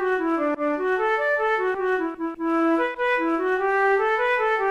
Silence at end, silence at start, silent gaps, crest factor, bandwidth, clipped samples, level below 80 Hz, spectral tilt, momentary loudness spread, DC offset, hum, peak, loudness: 0 s; 0 s; none; 10 dB; 11 kHz; under 0.1%; -56 dBFS; -4.5 dB/octave; 4 LU; under 0.1%; none; -12 dBFS; -22 LUFS